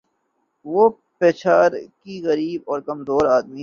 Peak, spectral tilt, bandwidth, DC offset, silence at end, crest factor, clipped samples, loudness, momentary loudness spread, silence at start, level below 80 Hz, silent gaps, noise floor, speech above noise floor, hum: -2 dBFS; -6.5 dB/octave; 7.2 kHz; under 0.1%; 0 s; 18 dB; under 0.1%; -19 LUFS; 11 LU; 0.65 s; -58 dBFS; none; -70 dBFS; 51 dB; none